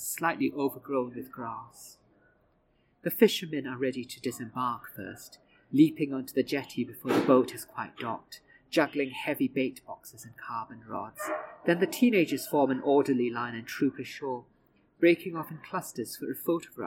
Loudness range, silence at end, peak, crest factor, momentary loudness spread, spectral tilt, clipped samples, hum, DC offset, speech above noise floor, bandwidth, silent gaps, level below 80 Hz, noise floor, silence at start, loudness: 5 LU; 0 s; -8 dBFS; 22 dB; 17 LU; -5 dB/octave; under 0.1%; none; under 0.1%; 39 dB; 17 kHz; none; -74 dBFS; -69 dBFS; 0 s; -30 LUFS